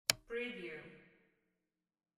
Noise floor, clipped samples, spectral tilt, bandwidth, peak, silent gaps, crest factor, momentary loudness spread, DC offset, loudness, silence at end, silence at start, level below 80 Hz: -89 dBFS; under 0.1%; -1 dB/octave; 13 kHz; -10 dBFS; none; 36 dB; 21 LU; under 0.1%; -42 LUFS; 1.15 s; 0.1 s; -74 dBFS